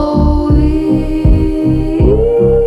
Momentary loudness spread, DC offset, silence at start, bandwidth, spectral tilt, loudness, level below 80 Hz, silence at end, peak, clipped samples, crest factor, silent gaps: 3 LU; under 0.1%; 0 s; 10.5 kHz; -10 dB/octave; -12 LUFS; -14 dBFS; 0 s; 0 dBFS; under 0.1%; 10 dB; none